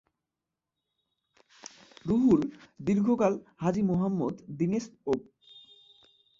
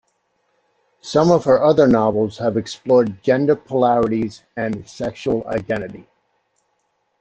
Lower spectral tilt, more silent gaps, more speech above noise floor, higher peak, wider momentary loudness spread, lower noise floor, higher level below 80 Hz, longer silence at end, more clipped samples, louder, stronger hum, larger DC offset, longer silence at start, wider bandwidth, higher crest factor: about the same, -8 dB/octave vs -7 dB/octave; neither; first, 61 dB vs 51 dB; second, -12 dBFS vs -2 dBFS; first, 18 LU vs 12 LU; first, -88 dBFS vs -69 dBFS; second, -62 dBFS vs -52 dBFS; second, 0.8 s vs 1.2 s; neither; second, -29 LUFS vs -18 LUFS; neither; neither; first, 2.05 s vs 1.05 s; second, 7.6 kHz vs 8.6 kHz; about the same, 18 dB vs 18 dB